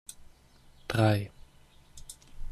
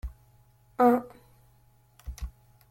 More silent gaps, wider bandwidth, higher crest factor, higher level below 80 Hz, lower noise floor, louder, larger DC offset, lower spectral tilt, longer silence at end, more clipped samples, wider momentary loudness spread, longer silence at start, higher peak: neither; second, 14.5 kHz vs 16.5 kHz; about the same, 22 dB vs 22 dB; about the same, -48 dBFS vs -46 dBFS; about the same, -58 dBFS vs -61 dBFS; second, -28 LUFS vs -25 LUFS; neither; second, -6 dB/octave vs -7.5 dB/octave; second, 0 s vs 0.4 s; neither; about the same, 23 LU vs 24 LU; about the same, 0.1 s vs 0.05 s; about the same, -12 dBFS vs -10 dBFS